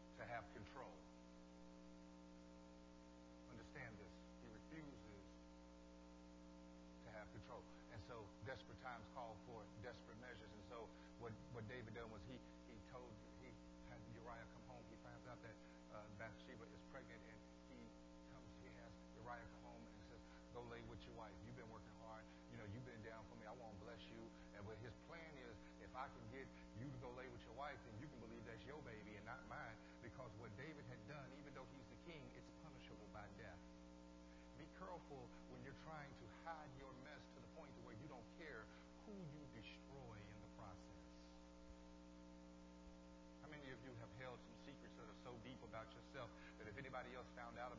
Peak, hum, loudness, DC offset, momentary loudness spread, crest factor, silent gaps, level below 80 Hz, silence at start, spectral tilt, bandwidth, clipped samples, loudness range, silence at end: -38 dBFS; 60 Hz at -65 dBFS; -59 LUFS; under 0.1%; 8 LU; 20 dB; none; -70 dBFS; 0 s; -5 dB/octave; 7.2 kHz; under 0.1%; 5 LU; 0 s